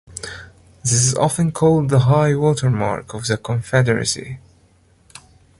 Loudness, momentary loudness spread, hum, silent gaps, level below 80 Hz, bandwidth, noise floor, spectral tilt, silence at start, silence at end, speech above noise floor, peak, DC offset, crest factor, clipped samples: -18 LUFS; 16 LU; none; none; -46 dBFS; 11.5 kHz; -54 dBFS; -5 dB/octave; 0.1 s; 1.2 s; 37 dB; -4 dBFS; under 0.1%; 16 dB; under 0.1%